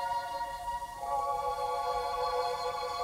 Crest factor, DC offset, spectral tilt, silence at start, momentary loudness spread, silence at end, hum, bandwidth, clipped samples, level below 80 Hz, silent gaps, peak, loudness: 14 dB; under 0.1%; -2.5 dB/octave; 0 s; 5 LU; 0 s; none; 16 kHz; under 0.1%; -56 dBFS; none; -20 dBFS; -34 LUFS